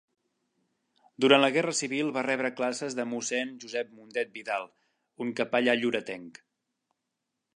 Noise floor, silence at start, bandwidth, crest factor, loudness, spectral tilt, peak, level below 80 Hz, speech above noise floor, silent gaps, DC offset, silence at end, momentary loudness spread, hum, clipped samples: -84 dBFS; 1.2 s; 11 kHz; 26 dB; -28 LUFS; -3 dB/octave; -4 dBFS; -82 dBFS; 55 dB; none; under 0.1%; 1.25 s; 13 LU; none; under 0.1%